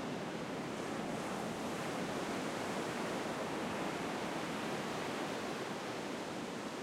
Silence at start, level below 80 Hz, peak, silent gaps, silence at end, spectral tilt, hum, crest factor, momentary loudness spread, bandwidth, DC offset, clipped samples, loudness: 0 s; -70 dBFS; -26 dBFS; none; 0 s; -4.5 dB/octave; none; 14 dB; 3 LU; 16 kHz; under 0.1%; under 0.1%; -40 LUFS